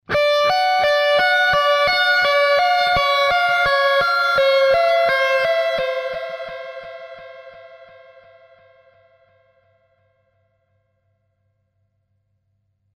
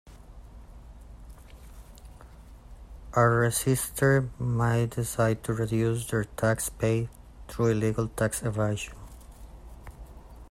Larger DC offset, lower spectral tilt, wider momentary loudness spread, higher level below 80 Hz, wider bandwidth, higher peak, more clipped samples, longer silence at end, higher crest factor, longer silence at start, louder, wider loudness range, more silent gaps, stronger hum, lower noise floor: neither; second, -2 dB/octave vs -6 dB/octave; second, 17 LU vs 24 LU; about the same, -50 dBFS vs -46 dBFS; about the same, 15.5 kHz vs 16 kHz; first, -6 dBFS vs -10 dBFS; neither; first, 5.2 s vs 0.05 s; second, 14 dB vs 20 dB; about the same, 0.1 s vs 0.05 s; first, -16 LUFS vs -27 LUFS; first, 16 LU vs 5 LU; neither; first, 50 Hz at -70 dBFS vs none; first, -68 dBFS vs -48 dBFS